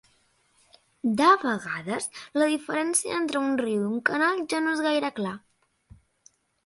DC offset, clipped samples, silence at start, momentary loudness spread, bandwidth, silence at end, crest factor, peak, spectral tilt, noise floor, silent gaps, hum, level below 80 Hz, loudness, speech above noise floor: under 0.1%; under 0.1%; 1.05 s; 11 LU; 12 kHz; 1.3 s; 22 dB; -6 dBFS; -3.5 dB/octave; -66 dBFS; none; none; -68 dBFS; -25 LUFS; 41 dB